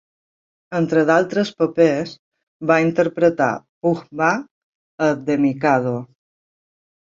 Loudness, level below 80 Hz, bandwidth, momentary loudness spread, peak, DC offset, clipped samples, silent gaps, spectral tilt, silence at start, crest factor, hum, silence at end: -19 LUFS; -62 dBFS; 7.6 kHz; 9 LU; -2 dBFS; under 0.1%; under 0.1%; 2.19-2.32 s, 2.43-2.60 s, 3.69-3.81 s, 4.51-4.98 s; -6.5 dB/octave; 0.7 s; 18 dB; none; 0.95 s